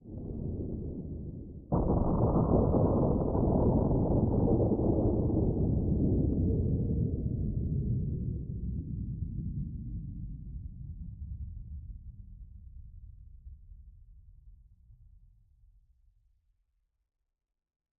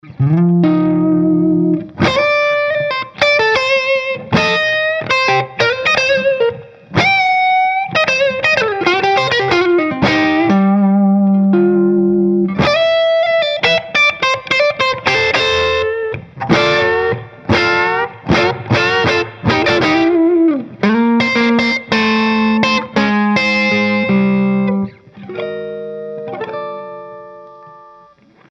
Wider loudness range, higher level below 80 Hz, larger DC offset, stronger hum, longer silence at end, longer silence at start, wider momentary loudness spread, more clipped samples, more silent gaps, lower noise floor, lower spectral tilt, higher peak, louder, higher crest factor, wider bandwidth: first, 19 LU vs 3 LU; first, -40 dBFS vs -46 dBFS; neither; neither; first, 3.05 s vs 0.7 s; about the same, 0.05 s vs 0.05 s; first, 18 LU vs 9 LU; neither; neither; first, -78 dBFS vs -46 dBFS; first, -16.5 dB/octave vs -5.5 dB/octave; second, -14 dBFS vs 0 dBFS; second, -31 LUFS vs -13 LUFS; about the same, 18 dB vs 14 dB; second, 1.6 kHz vs 7.8 kHz